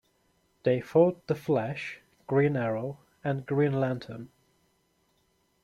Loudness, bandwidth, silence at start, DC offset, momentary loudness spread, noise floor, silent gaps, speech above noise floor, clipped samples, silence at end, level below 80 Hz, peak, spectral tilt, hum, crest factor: -28 LUFS; 13 kHz; 0.65 s; under 0.1%; 15 LU; -71 dBFS; none; 44 dB; under 0.1%; 1.4 s; -68 dBFS; -10 dBFS; -8.5 dB/octave; none; 20 dB